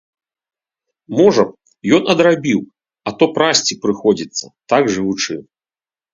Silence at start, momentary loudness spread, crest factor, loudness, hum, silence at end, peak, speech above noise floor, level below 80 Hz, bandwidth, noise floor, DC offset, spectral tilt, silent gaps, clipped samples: 1.1 s; 13 LU; 16 dB; -16 LUFS; none; 0.7 s; 0 dBFS; over 75 dB; -58 dBFS; 7.8 kHz; under -90 dBFS; under 0.1%; -4 dB/octave; none; under 0.1%